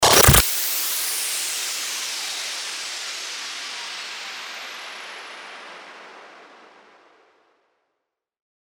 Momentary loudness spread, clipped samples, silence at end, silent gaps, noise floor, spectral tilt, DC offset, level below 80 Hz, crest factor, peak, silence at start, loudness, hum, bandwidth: 22 LU; under 0.1%; 2 s; none; -80 dBFS; -2 dB/octave; under 0.1%; -38 dBFS; 24 dB; 0 dBFS; 0 s; -21 LUFS; none; over 20 kHz